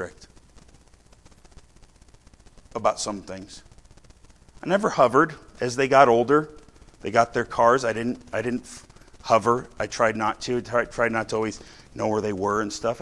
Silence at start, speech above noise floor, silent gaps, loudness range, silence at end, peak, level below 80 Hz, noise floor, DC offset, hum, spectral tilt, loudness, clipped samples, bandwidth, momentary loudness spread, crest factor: 0 s; 31 dB; none; 12 LU; 0 s; -2 dBFS; -52 dBFS; -54 dBFS; under 0.1%; none; -5 dB/octave; -23 LUFS; under 0.1%; 12 kHz; 19 LU; 24 dB